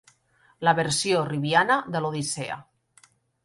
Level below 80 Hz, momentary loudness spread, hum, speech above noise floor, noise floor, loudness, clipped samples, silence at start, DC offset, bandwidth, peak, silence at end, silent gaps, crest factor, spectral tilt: -64 dBFS; 10 LU; none; 38 dB; -63 dBFS; -24 LUFS; under 0.1%; 0.6 s; under 0.1%; 11.5 kHz; -6 dBFS; 0.85 s; none; 20 dB; -4 dB/octave